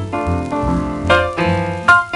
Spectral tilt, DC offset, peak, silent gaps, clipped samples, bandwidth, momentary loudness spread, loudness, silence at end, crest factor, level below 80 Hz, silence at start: -6 dB/octave; under 0.1%; 0 dBFS; none; under 0.1%; 11.5 kHz; 7 LU; -16 LUFS; 0 s; 16 dB; -32 dBFS; 0 s